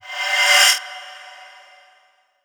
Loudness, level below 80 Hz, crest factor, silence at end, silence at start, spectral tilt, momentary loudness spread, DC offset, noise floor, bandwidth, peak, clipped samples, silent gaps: -14 LUFS; under -90 dBFS; 20 dB; 1 s; 0.05 s; 6.5 dB/octave; 23 LU; under 0.1%; -59 dBFS; over 20 kHz; 0 dBFS; under 0.1%; none